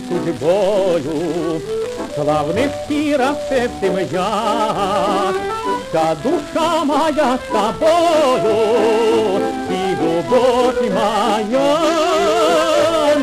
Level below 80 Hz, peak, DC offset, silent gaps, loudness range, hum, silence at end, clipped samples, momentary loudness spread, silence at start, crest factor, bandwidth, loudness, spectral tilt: -46 dBFS; -4 dBFS; under 0.1%; none; 3 LU; none; 0 s; under 0.1%; 6 LU; 0 s; 12 dB; 15.5 kHz; -16 LUFS; -4.5 dB/octave